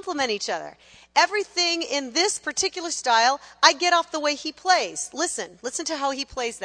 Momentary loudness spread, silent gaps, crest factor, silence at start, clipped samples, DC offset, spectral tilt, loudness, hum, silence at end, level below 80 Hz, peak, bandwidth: 10 LU; none; 24 dB; 0.05 s; under 0.1%; under 0.1%; 0 dB/octave; -23 LUFS; none; 0 s; -62 dBFS; 0 dBFS; 10.5 kHz